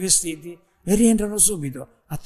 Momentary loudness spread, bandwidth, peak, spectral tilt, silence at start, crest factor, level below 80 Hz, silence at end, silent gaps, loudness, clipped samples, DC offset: 18 LU; 14 kHz; -4 dBFS; -3.5 dB/octave; 0 s; 18 dB; -42 dBFS; 0 s; none; -19 LUFS; under 0.1%; under 0.1%